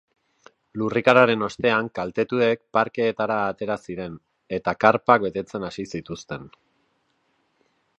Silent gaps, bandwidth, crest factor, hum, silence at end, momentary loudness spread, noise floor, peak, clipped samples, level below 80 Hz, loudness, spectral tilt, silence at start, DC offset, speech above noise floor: none; 8.6 kHz; 24 dB; none; 1.5 s; 17 LU; -69 dBFS; 0 dBFS; under 0.1%; -60 dBFS; -22 LUFS; -6 dB/octave; 0.75 s; under 0.1%; 46 dB